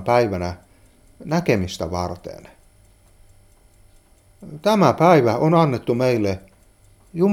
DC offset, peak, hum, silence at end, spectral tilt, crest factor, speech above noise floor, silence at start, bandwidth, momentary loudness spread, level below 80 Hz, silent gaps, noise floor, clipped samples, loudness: under 0.1%; 0 dBFS; none; 0 s; -7 dB/octave; 20 dB; 34 dB; 0 s; 16 kHz; 20 LU; -50 dBFS; none; -53 dBFS; under 0.1%; -19 LUFS